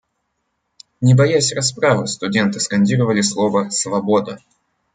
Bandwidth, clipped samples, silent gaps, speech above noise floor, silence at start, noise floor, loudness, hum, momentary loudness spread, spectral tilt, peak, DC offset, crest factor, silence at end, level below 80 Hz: 9.6 kHz; under 0.1%; none; 55 dB; 1 s; -71 dBFS; -17 LUFS; none; 6 LU; -5 dB/octave; -2 dBFS; under 0.1%; 16 dB; 0.6 s; -58 dBFS